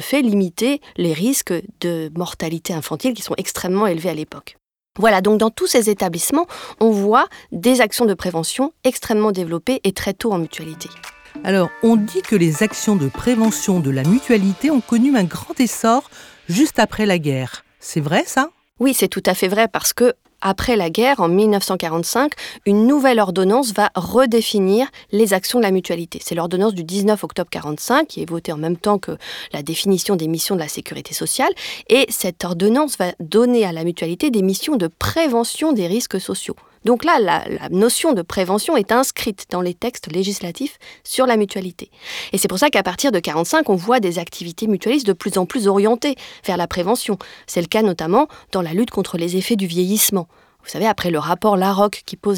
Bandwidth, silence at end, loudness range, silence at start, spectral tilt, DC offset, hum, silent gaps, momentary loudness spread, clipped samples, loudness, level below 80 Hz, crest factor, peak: over 20 kHz; 0 s; 4 LU; 0 s; -4.5 dB/octave; under 0.1%; none; none; 10 LU; under 0.1%; -18 LUFS; -50 dBFS; 16 dB; -2 dBFS